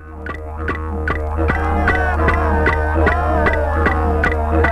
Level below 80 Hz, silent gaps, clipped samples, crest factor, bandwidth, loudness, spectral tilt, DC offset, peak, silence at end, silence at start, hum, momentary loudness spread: -22 dBFS; none; under 0.1%; 14 dB; 6 kHz; -17 LUFS; -8 dB/octave; under 0.1%; -2 dBFS; 0 s; 0 s; none; 8 LU